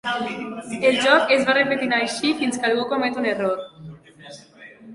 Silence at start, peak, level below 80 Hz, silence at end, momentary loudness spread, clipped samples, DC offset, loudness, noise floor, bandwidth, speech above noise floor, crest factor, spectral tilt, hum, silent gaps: 0.05 s; -4 dBFS; -64 dBFS; 0 s; 14 LU; under 0.1%; under 0.1%; -20 LUFS; -45 dBFS; 11.5 kHz; 24 dB; 18 dB; -3.5 dB/octave; none; none